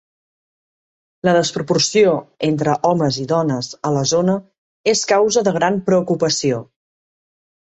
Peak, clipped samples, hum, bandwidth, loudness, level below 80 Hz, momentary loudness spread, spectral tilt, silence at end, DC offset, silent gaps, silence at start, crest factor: -2 dBFS; under 0.1%; none; 8.2 kHz; -17 LUFS; -58 dBFS; 7 LU; -4.5 dB/octave; 1 s; under 0.1%; 4.58-4.84 s; 1.25 s; 16 dB